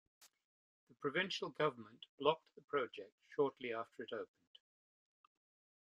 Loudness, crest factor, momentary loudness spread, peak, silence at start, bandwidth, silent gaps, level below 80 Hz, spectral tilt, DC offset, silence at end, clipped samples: -41 LUFS; 26 dB; 14 LU; -18 dBFS; 0.2 s; 11 kHz; 0.45-0.87 s, 2.09-2.18 s, 2.64-2.68 s, 3.12-3.18 s; -88 dBFS; -4.5 dB/octave; under 0.1%; 1.6 s; under 0.1%